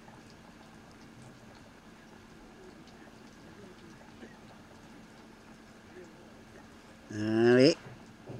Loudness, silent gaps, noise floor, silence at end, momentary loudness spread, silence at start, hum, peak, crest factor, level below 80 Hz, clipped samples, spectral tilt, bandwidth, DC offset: -26 LUFS; none; -54 dBFS; 0 s; 27 LU; 4.2 s; none; -10 dBFS; 26 dB; -66 dBFS; under 0.1%; -6 dB/octave; 11 kHz; under 0.1%